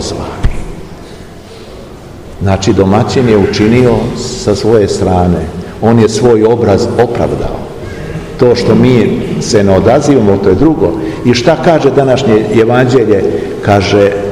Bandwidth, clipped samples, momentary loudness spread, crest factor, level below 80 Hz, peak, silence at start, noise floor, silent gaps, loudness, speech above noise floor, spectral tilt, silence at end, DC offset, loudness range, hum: 12.5 kHz; 3%; 16 LU; 10 dB; -26 dBFS; 0 dBFS; 0 s; -29 dBFS; none; -9 LUFS; 21 dB; -6.5 dB/octave; 0 s; 0.8%; 3 LU; none